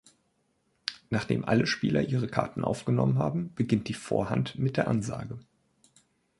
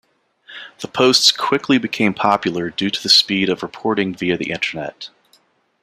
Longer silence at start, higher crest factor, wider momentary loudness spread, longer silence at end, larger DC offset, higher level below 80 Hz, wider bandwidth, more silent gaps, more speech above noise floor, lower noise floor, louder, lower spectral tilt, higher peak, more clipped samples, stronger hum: first, 0.85 s vs 0.5 s; about the same, 22 dB vs 18 dB; second, 12 LU vs 20 LU; first, 1 s vs 0.75 s; neither; about the same, -56 dBFS vs -60 dBFS; second, 11.5 kHz vs 15.5 kHz; neither; first, 45 dB vs 40 dB; first, -73 dBFS vs -58 dBFS; second, -29 LUFS vs -16 LUFS; first, -6.5 dB/octave vs -3 dB/octave; second, -6 dBFS vs 0 dBFS; neither; neither